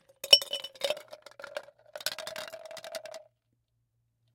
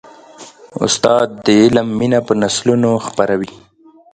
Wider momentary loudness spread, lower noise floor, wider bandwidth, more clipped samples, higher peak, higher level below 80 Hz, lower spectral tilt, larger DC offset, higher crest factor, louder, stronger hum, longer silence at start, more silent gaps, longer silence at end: first, 24 LU vs 9 LU; first, -77 dBFS vs -39 dBFS; first, 17 kHz vs 10 kHz; neither; about the same, -2 dBFS vs 0 dBFS; second, -82 dBFS vs -50 dBFS; second, 1 dB/octave vs -4.5 dB/octave; neither; first, 32 dB vs 16 dB; second, -26 LUFS vs -14 LUFS; neither; second, 0.25 s vs 0.4 s; neither; first, 1.15 s vs 0.6 s